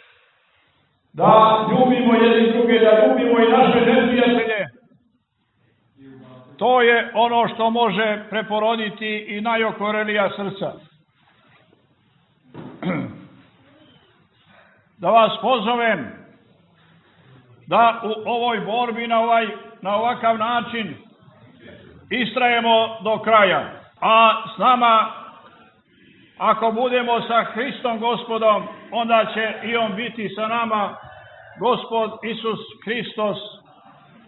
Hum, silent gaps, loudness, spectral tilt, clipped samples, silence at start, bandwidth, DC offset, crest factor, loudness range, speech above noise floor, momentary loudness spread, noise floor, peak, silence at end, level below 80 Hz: none; none; -19 LUFS; -9.5 dB/octave; under 0.1%; 1.15 s; 4.2 kHz; under 0.1%; 20 dB; 10 LU; 49 dB; 13 LU; -67 dBFS; 0 dBFS; 0.75 s; -64 dBFS